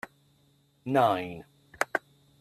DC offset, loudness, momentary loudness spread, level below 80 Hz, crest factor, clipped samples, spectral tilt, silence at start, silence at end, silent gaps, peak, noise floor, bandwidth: under 0.1%; -29 LUFS; 20 LU; -70 dBFS; 26 dB; under 0.1%; -5.5 dB/octave; 0.85 s; 0.4 s; none; -6 dBFS; -66 dBFS; 14.5 kHz